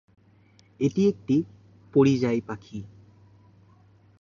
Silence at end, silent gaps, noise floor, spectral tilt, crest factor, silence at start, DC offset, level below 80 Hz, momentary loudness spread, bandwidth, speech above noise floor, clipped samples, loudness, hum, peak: 1.35 s; none; -58 dBFS; -7.5 dB/octave; 18 dB; 0.8 s; under 0.1%; -62 dBFS; 19 LU; 7.4 kHz; 35 dB; under 0.1%; -25 LUFS; none; -8 dBFS